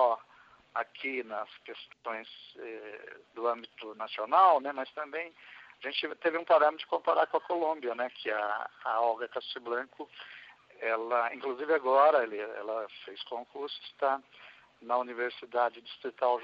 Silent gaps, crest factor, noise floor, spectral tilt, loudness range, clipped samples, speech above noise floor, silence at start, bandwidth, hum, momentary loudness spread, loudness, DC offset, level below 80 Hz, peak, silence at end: none; 22 dB; -60 dBFS; -5 dB/octave; 7 LU; under 0.1%; 29 dB; 0 s; 5.6 kHz; none; 20 LU; -31 LUFS; under 0.1%; -88 dBFS; -10 dBFS; 0 s